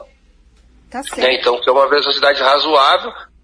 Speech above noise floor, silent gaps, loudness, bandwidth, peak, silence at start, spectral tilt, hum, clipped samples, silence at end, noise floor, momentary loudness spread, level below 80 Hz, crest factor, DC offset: 36 dB; none; -13 LUFS; 11 kHz; 0 dBFS; 0 s; -1.5 dB/octave; none; under 0.1%; 0.2 s; -50 dBFS; 16 LU; -50 dBFS; 14 dB; under 0.1%